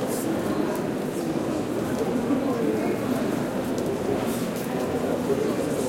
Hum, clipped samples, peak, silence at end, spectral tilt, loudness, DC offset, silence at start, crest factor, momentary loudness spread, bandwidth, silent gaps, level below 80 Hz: none; under 0.1%; -12 dBFS; 0 s; -6 dB/octave; -26 LUFS; under 0.1%; 0 s; 14 dB; 3 LU; 17 kHz; none; -54 dBFS